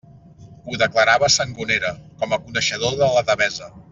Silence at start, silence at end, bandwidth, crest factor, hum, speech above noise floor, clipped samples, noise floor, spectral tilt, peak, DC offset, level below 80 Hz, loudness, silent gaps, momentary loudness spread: 0.4 s; 0.1 s; 7.8 kHz; 18 dB; none; 24 dB; under 0.1%; -44 dBFS; -2.5 dB/octave; -2 dBFS; under 0.1%; -52 dBFS; -19 LUFS; none; 13 LU